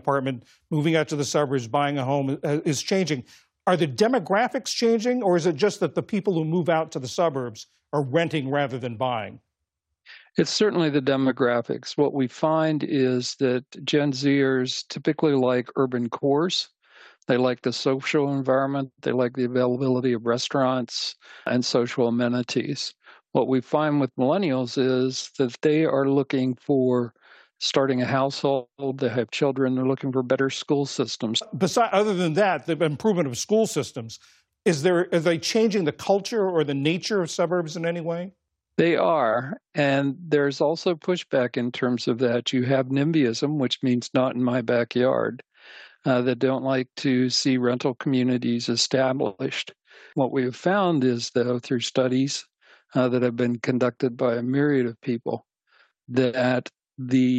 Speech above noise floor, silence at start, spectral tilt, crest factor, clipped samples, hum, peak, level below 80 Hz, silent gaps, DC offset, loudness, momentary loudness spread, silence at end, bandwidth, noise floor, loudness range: 59 dB; 0.05 s; -5.5 dB/octave; 18 dB; under 0.1%; none; -6 dBFS; -74 dBFS; none; under 0.1%; -24 LUFS; 7 LU; 0 s; 12.5 kHz; -82 dBFS; 2 LU